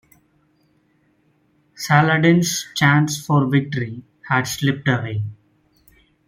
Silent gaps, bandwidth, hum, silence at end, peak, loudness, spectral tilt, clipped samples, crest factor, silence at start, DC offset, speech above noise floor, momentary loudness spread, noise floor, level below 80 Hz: none; 16.5 kHz; none; 0.95 s; -2 dBFS; -18 LUFS; -5 dB/octave; under 0.1%; 20 dB; 1.8 s; under 0.1%; 44 dB; 14 LU; -62 dBFS; -58 dBFS